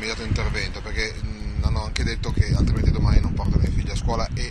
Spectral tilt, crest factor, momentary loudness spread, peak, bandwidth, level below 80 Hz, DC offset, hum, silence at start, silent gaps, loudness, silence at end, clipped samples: -6 dB/octave; 20 dB; 7 LU; -2 dBFS; 11 kHz; -24 dBFS; under 0.1%; none; 0 s; none; -24 LUFS; 0 s; under 0.1%